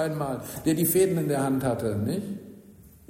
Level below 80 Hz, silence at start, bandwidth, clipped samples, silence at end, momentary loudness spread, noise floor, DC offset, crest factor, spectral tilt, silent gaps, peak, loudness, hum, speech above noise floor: -56 dBFS; 0 s; 16 kHz; under 0.1%; 0.2 s; 10 LU; -51 dBFS; under 0.1%; 16 dB; -6 dB/octave; none; -12 dBFS; -26 LUFS; none; 25 dB